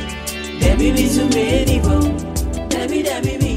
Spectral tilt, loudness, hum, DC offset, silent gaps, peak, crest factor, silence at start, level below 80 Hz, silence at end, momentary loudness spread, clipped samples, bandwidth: -5.5 dB/octave; -17 LUFS; none; under 0.1%; none; -2 dBFS; 16 dB; 0 s; -22 dBFS; 0 s; 8 LU; under 0.1%; 16 kHz